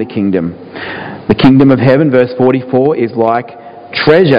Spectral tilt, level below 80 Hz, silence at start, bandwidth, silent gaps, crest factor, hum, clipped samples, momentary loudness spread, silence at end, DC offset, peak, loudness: -9 dB/octave; -40 dBFS; 0 s; 5.2 kHz; none; 10 dB; none; 1%; 15 LU; 0 s; under 0.1%; 0 dBFS; -10 LUFS